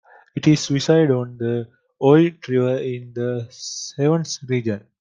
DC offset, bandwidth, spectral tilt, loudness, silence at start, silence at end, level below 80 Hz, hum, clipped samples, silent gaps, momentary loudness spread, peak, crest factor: under 0.1%; 9.4 kHz; -6 dB/octave; -20 LUFS; 0.35 s; 0.2 s; -62 dBFS; none; under 0.1%; none; 13 LU; -2 dBFS; 18 dB